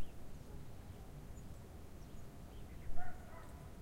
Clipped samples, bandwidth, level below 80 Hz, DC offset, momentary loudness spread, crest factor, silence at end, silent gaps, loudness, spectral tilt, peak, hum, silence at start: under 0.1%; 15.5 kHz; -52 dBFS; under 0.1%; 4 LU; 18 dB; 0 s; none; -54 LUFS; -6 dB/octave; -24 dBFS; none; 0 s